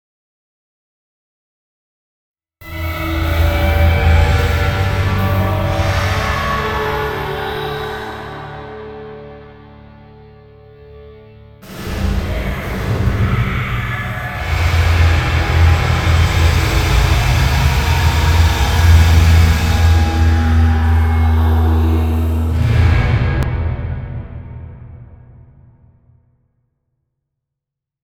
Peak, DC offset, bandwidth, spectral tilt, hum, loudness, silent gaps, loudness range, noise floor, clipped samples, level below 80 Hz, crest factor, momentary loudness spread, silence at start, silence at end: 0 dBFS; under 0.1%; 17 kHz; -6 dB/octave; none; -15 LUFS; none; 16 LU; -82 dBFS; under 0.1%; -20 dBFS; 16 dB; 16 LU; 2.6 s; 2.9 s